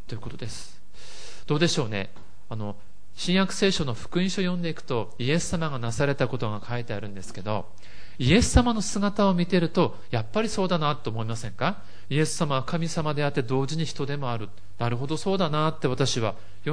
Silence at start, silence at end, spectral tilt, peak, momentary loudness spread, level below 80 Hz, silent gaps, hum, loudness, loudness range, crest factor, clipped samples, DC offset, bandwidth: 0.1 s; 0 s; -5 dB/octave; -4 dBFS; 15 LU; -42 dBFS; none; none; -26 LUFS; 5 LU; 22 dB; under 0.1%; 3%; 10.5 kHz